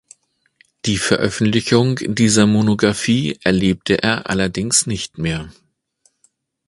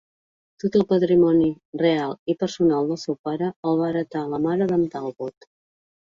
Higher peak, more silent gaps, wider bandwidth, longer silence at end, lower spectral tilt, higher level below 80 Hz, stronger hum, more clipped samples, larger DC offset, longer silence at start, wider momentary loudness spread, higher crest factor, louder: first, 0 dBFS vs -8 dBFS; second, none vs 1.65-1.73 s, 2.19-2.26 s, 3.19-3.24 s, 3.56-3.63 s; first, 11.5 kHz vs 7.4 kHz; first, 1.15 s vs 0.8 s; second, -4.5 dB/octave vs -7.5 dB/octave; first, -44 dBFS vs -62 dBFS; neither; neither; neither; first, 0.85 s vs 0.65 s; about the same, 9 LU vs 10 LU; about the same, 18 dB vs 16 dB; first, -17 LUFS vs -22 LUFS